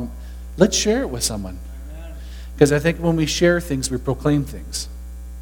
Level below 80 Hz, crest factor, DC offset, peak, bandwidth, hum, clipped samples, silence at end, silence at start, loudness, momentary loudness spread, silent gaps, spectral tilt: -34 dBFS; 20 dB; under 0.1%; 0 dBFS; 19 kHz; none; under 0.1%; 0 s; 0 s; -20 LUFS; 19 LU; none; -4.5 dB/octave